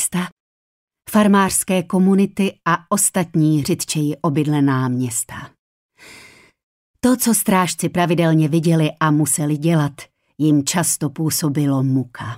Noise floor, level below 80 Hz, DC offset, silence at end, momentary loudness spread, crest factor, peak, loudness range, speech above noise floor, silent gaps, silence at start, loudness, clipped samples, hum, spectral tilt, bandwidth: -46 dBFS; -56 dBFS; under 0.1%; 0 s; 6 LU; 14 dB; -4 dBFS; 4 LU; 29 dB; 0.32-0.88 s, 5.59-5.89 s, 6.63-6.94 s; 0 s; -18 LUFS; under 0.1%; none; -5 dB/octave; 16 kHz